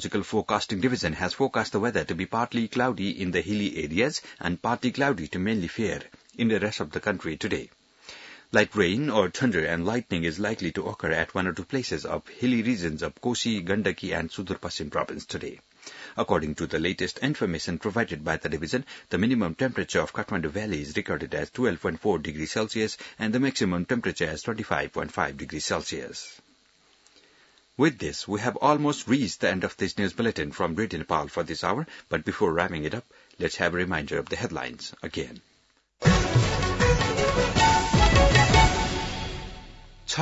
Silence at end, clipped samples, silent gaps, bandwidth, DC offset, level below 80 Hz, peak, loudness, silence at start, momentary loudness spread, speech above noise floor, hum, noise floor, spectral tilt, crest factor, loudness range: 0 s; under 0.1%; none; 8 kHz; under 0.1%; -38 dBFS; -6 dBFS; -27 LUFS; 0 s; 11 LU; 38 dB; none; -66 dBFS; -5 dB/octave; 22 dB; 8 LU